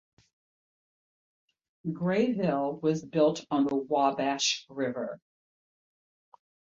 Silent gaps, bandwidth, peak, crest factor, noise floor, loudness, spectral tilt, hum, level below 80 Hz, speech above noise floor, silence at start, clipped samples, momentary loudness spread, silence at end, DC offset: none; 7.8 kHz; -12 dBFS; 18 dB; under -90 dBFS; -29 LUFS; -4.5 dB/octave; none; -72 dBFS; over 62 dB; 1.85 s; under 0.1%; 11 LU; 1.5 s; under 0.1%